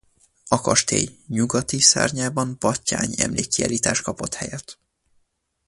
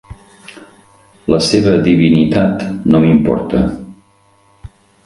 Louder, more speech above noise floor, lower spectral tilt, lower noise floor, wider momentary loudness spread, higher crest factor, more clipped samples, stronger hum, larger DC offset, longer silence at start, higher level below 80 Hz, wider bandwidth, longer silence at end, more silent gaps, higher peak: second, -21 LUFS vs -12 LUFS; first, 46 dB vs 40 dB; second, -3 dB/octave vs -6.5 dB/octave; first, -68 dBFS vs -51 dBFS; first, 13 LU vs 8 LU; first, 22 dB vs 14 dB; neither; neither; neither; first, 0.45 s vs 0.1 s; second, -50 dBFS vs -36 dBFS; about the same, 11.5 kHz vs 11.5 kHz; first, 0.95 s vs 0.4 s; neither; about the same, 0 dBFS vs 0 dBFS